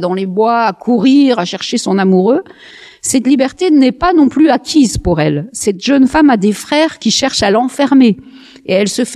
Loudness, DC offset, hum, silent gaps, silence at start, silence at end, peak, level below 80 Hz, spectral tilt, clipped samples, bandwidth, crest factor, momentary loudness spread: -11 LUFS; under 0.1%; none; none; 0 s; 0 s; 0 dBFS; -36 dBFS; -4.5 dB/octave; under 0.1%; 13.5 kHz; 12 dB; 7 LU